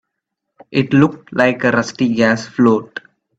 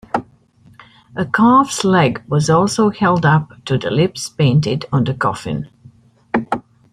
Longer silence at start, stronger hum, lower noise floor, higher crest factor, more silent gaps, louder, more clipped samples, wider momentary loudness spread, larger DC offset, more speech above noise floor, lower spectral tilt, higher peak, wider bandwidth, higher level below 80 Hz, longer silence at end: first, 0.7 s vs 0.15 s; neither; first, -77 dBFS vs -49 dBFS; about the same, 16 dB vs 16 dB; neither; about the same, -15 LUFS vs -16 LUFS; neither; second, 7 LU vs 12 LU; neither; first, 62 dB vs 34 dB; about the same, -6.5 dB/octave vs -6 dB/octave; about the same, 0 dBFS vs -2 dBFS; second, 8 kHz vs 12.5 kHz; about the same, -54 dBFS vs -50 dBFS; about the same, 0.4 s vs 0.35 s